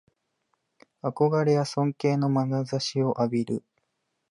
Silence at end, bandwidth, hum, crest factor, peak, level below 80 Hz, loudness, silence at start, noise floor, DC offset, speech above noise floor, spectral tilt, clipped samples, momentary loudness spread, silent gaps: 0.7 s; 11 kHz; none; 16 dB; -10 dBFS; -72 dBFS; -26 LUFS; 1.05 s; -78 dBFS; under 0.1%; 53 dB; -7 dB/octave; under 0.1%; 9 LU; none